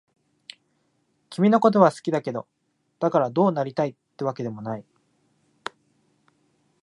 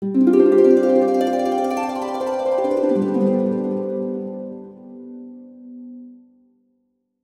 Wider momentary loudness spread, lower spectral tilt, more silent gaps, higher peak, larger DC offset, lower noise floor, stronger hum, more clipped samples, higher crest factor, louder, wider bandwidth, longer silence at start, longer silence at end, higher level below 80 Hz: second, 21 LU vs 24 LU; about the same, -7.5 dB/octave vs -7.5 dB/octave; neither; about the same, -2 dBFS vs -2 dBFS; neither; about the same, -70 dBFS vs -69 dBFS; neither; neither; first, 24 dB vs 18 dB; second, -23 LUFS vs -18 LUFS; about the same, 11.5 kHz vs 12.5 kHz; first, 1.3 s vs 0 s; first, 2.05 s vs 1.1 s; second, -74 dBFS vs -66 dBFS